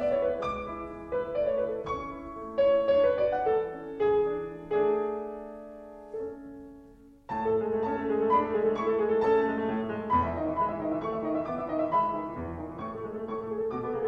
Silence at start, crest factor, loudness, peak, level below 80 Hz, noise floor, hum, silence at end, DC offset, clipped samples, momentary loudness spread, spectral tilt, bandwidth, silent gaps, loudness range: 0 s; 16 dB; -29 LUFS; -12 dBFS; -54 dBFS; -53 dBFS; none; 0 s; under 0.1%; under 0.1%; 14 LU; -8 dB/octave; 6.2 kHz; none; 5 LU